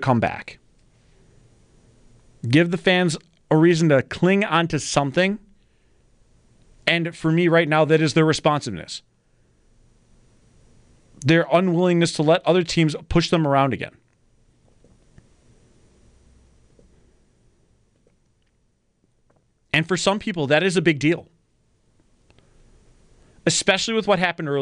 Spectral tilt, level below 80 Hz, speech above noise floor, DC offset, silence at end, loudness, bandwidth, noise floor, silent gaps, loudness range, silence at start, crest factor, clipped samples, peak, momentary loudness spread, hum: -5 dB/octave; -50 dBFS; 47 dB; under 0.1%; 0 s; -20 LUFS; 10.5 kHz; -66 dBFS; none; 6 LU; 0 s; 18 dB; under 0.1%; -4 dBFS; 10 LU; none